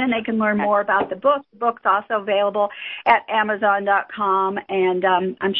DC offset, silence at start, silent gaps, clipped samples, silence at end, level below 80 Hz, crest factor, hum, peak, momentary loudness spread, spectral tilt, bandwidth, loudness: under 0.1%; 0 s; none; under 0.1%; 0 s; -62 dBFS; 18 dB; none; -2 dBFS; 4 LU; -8.5 dB/octave; 5.4 kHz; -20 LUFS